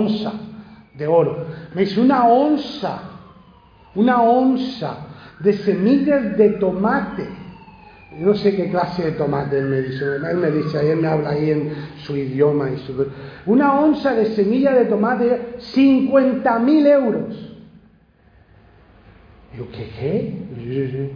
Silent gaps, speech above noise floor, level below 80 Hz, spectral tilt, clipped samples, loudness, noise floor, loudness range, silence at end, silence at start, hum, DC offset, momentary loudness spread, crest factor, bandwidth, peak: none; 35 dB; -52 dBFS; -9 dB/octave; under 0.1%; -18 LUFS; -53 dBFS; 5 LU; 0 s; 0 s; none; under 0.1%; 16 LU; 16 dB; 5.2 kHz; -2 dBFS